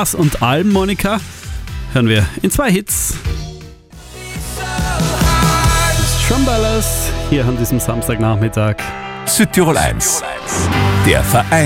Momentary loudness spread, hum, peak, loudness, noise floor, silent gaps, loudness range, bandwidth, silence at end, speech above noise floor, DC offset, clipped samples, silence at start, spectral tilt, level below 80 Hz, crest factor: 12 LU; none; 0 dBFS; -15 LUFS; -35 dBFS; none; 3 LU; 17 kHz; 0 s; 21 dB; under 0.1%; under 0.1%; 0 s; -4.5 dB/octave; -24 dBFS; 14 dB